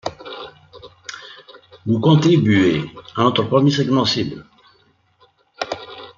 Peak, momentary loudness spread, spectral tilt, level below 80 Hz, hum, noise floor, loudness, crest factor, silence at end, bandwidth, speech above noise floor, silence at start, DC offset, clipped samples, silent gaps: -2 dBFS; 21 LU; -6.5 dB/octave; -56 dBFS; none; -58 dBFS; -17 LUFS; 18 dB; 0.1 s; 7.4 kHz; 42 dB; 0.05 s; under 0.1%; under 0.1%; none